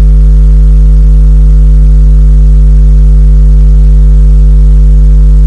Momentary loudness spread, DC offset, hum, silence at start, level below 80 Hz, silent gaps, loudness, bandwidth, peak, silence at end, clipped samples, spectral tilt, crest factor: 0 LU; under 0.1%; none; 0 s; -2 dBFS; none; -6 LUFS; 1.4 kHz; 0 dBFS; 0 s; 0.5%; -9.5 dB/octave; 2 dB